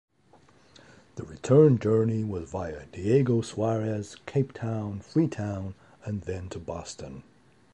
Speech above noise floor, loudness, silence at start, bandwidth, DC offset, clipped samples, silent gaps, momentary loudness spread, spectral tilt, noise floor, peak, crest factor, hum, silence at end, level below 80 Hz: 33 dB; -27 LUFS; 1.15 s; 10.5 kHz; under 0.1%; under 0.1%; none; 20 LU; -8 dB/octave; -60 dBFS; -8 dBFS; 20 dB; none; 0.55 s; -52 dBFS